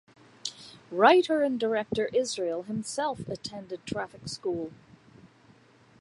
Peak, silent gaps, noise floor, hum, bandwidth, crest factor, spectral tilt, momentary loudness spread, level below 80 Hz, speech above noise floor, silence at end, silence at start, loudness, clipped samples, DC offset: -6 dBFS; none; -58 dBFS; none; 11.5 kHz; 24 dB; -4 dB/octave; 17 LU; -66 dBFS; 31 dB; 0.75 s; 0.45 s; -28 LUFS; under 0.1%; under 0.1%